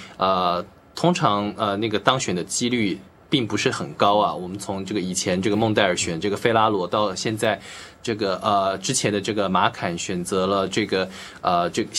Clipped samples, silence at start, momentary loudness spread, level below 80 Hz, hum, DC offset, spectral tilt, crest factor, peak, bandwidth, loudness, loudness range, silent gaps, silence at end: under 0.1%; 0 s; 8 LU; -56 dBFS; none; under 0.1%; -4 dB/octave; 22 dB; 0 dBFS; 14.5 kHz; -22 LUFS; 1 LU; none; 0 s